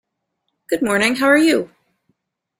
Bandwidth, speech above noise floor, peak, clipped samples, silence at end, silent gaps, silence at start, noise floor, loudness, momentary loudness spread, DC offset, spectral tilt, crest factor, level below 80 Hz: 16 kHz; 59 dB; -2 dBFS; under 0.1%; 0.95 s; none; 0.7 s; -75 dBFS; -16 LUFS; 11 LU; under 0.1%; -3.5 dB/octave; 18 dB; -60 dBFS